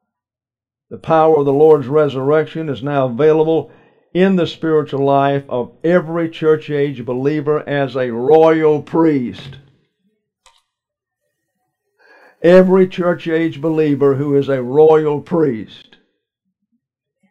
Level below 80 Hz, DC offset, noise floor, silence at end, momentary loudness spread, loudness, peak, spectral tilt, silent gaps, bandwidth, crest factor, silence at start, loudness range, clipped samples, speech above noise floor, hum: -56 dBFS; under 0.1%; under -90 dBFS; 1.55 s; 9 LU; -14 LUFS; 0 dBFS; -8.5 dB/octave; none; 7.2 kHz; 16 dB; 0.9 s; 3 LU; under 0.1%; over 76 dB; none